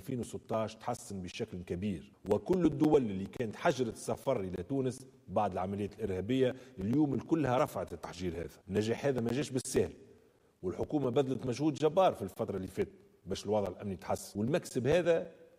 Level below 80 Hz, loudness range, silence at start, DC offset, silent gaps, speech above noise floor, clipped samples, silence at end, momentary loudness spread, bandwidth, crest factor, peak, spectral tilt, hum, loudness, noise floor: -60 dBFS; 2 LU; 0 s; under 0.1%; none; 32 dB; under 0.1%; 0.15 s; 11 LU; 15.5 kHz; 18 dB; -16 dBFS; -6.5 dB/octave; none; -34 LUFS; -65 dBFS